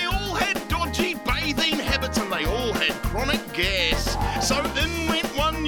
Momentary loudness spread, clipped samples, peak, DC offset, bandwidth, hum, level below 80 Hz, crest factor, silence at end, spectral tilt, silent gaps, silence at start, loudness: 3 LU; under 0.1%; -6 dBFS; under 0.1%; over 20 kHz; none; -32 dBFS; 18 dB; 0 s; -3.5 dB/octave; none; 0 s; -23 LUFS